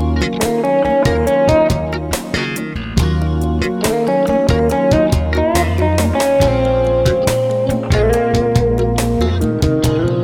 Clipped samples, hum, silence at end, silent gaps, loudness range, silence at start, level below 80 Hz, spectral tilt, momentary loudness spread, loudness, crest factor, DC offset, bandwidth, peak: under 0.1%; none; 0 s; none; 2 LU; 0 s; -24 dBFS; -6 dB/octave; 5 LU; -15 LUFS; 12 dB; under 0.1%; 17.5 kHz; -2 dBFS